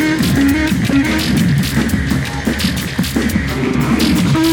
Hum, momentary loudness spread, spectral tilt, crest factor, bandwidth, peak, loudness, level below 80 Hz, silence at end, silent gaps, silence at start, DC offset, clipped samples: none; 5 LU; -5.5 dB/octave; 12 dB; over 20 kHz; -2 dBFS; -15 LUFS; -28 dBFS; 0 s; none; 0 s; under 0.1%; under 0.1%